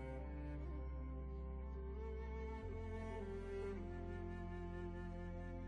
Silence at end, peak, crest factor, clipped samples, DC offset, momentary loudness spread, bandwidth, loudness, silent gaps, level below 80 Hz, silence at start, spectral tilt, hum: 0 s; -36 dBFS; 10 dB; under 0.1%; under 0.1%; 2 LU; 6.8 kHz; -49 LUFS; none; -50 dBFS; 0 s; -8.5 dB/octave; none